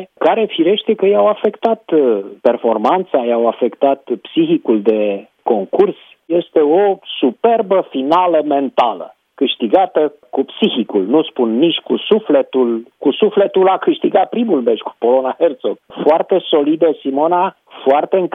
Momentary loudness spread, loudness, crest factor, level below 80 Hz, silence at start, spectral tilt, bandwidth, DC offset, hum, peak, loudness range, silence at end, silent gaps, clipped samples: 6 LU; -15 LUFS; 14 dB; -70 dBFS; 0 s; -8 dB/octave; 5 kHz; under 0.1%; none; 0 dBFS; 1 LU; 0.05 s; none; under 0.1%